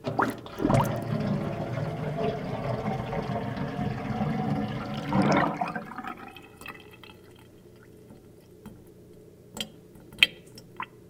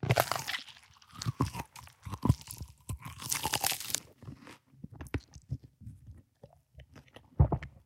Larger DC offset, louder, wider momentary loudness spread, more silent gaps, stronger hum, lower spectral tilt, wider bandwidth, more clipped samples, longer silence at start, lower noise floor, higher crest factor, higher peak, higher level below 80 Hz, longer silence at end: neither; first, -29 LUFS vs -34 LUFS; about the same, 25 LU vs 24 LU; neither; neither; first, -6 dB/octave vs -4 dB/octave; about the same, 17.5 kHz vs 17 kHz; neither; about the same, 0 s vs 0 s; second, -51 dBFS vs -60 dBFS; about the same, 30 dB vs 30 dB; first, 0 dBFS vs -6 dBFS; second, -52 dBFS vs -46 dBFS; second, 0 s vs 0.15 s